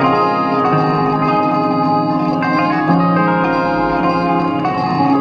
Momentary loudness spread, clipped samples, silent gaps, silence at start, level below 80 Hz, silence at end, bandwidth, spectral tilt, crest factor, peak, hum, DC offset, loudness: 2 LU; under 0.1%; none; 0 s; -44 dBFS; 0 s; 6.8 kHz; -8.5 dB/octave; 14 dB; 0 dBFS; none; under 0.1%; -15 LUFS